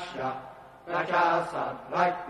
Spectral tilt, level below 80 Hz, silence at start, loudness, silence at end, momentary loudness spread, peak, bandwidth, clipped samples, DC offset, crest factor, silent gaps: -5.5 dB/octave; -66 dBFS; 0 s; -28 LUFS; 0 s; 17 LU; -10 dBFS; 12 kHz; under 0.1%; under 0.1%; 20 dB; none